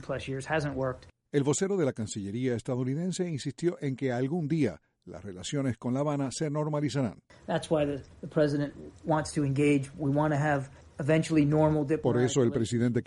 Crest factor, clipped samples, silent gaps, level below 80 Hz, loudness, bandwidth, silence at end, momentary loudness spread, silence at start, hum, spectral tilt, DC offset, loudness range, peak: 16 dB; under 0.1%; none; -58 dBFS; -29 LUFS; 11.5 kHz; 0 s; 10 LU; 0 s; none; -6.5 dB/octave; under 0.1%; 5 LU; -12 dBFS